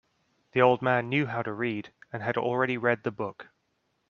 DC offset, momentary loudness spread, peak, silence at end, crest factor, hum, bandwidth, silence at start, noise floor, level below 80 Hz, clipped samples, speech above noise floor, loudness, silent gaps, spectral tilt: under 0.1%; 13 LU; -6 dBFS; 0.65 s; 24 dB; none; 6.6 kHz; 0.55 s; -75 dBFS; -70 dBFS; under 0.1%; 48 dB; -28 LUFS; none; -8 dB/octave